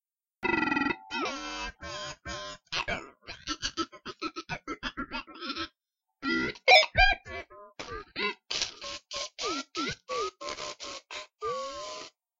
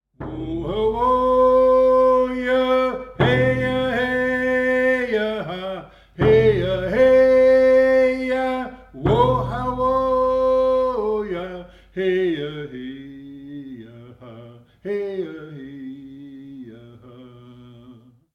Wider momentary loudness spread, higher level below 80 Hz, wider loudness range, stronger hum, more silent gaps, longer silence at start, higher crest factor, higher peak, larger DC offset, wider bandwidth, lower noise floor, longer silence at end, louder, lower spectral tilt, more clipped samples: second, 16 LU vs 22 LU; about the same, -46 dBFS vs -42 dBFS; second, 10 LU vs 16 LU; neither; neither; first, 0.4 s vs 0.2 s; first, 26 dB vs 16 dB; about the same, -6 dBFS vs -4 dBFS; neither; first, 15 kHz vs 6.8 kHz; first, -86 dBFS vs -48 dBFS; second, 0.3 s vs 0.45 s; second, -30 LUFS vs -19 LUFS; second, -2.5 dB/octave vs -7.5 dB/octave; neither